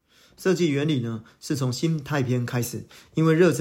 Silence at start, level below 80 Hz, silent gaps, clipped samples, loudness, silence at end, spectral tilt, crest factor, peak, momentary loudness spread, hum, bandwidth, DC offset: 0.4 s; -62 dBFS; none; under 0.1%; -25 LUFS; 0 s; -6 dB/octave; 16 dB; -8 dBFS; 11 LU; none; 16 kHz; under 0.1%